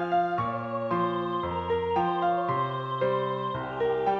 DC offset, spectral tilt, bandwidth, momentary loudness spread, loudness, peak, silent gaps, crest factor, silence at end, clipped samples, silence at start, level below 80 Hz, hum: under 0.1%; -8 dB/octave; 6.8 kHz; 4 LU; -28 LUFS; -14 dBFS; none; 14 dB; 0 s; under 0.1%; 0 s; -56 dBFS; none